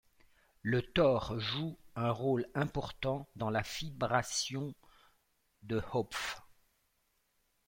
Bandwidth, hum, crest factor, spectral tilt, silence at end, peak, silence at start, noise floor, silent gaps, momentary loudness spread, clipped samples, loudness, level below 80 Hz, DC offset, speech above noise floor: 16.5 kHz; none; 22 dB; -5 dB/octave; 1.25 s; -14 dBFS; 0.65 s; -77 dBFS; none; 11 LU; under 0.1%; -35 LUFS; -58 dBFS; under 0.1%; 43 dB